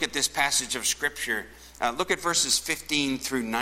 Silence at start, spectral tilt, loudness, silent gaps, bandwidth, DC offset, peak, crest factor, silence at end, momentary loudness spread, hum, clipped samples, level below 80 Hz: 0 s; -1 dB/octave; -25 LUFS; none; 16.5 kHz; under 0.1%; -6 dBFS; 22 dB; 0 s; 7 LU; none; under 0.1%; -54 dBFS